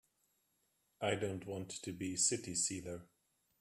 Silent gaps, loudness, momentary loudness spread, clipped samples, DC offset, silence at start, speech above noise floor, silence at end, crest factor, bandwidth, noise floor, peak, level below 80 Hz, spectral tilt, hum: none; -38 LUFS; 12 LU; under 0.1%; under 0.1%; 1 s; 41 dB; 0.55 s; 22 dB; 15 kHz; -80 dBFS; -20 dBFS; -74 dBFS; -3 dB/octave; none